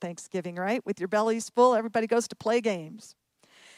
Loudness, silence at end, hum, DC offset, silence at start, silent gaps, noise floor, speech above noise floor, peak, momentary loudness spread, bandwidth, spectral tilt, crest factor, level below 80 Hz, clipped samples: -27 LUFS; 0.65 s; none; under 0.1%; 0 s; none; -58 dBFS; 31 dB; -10 dBFS; 13 LU; 14 kHz; -4.5 dB/octave; 18 dB; -78 dBFS; under 0.1%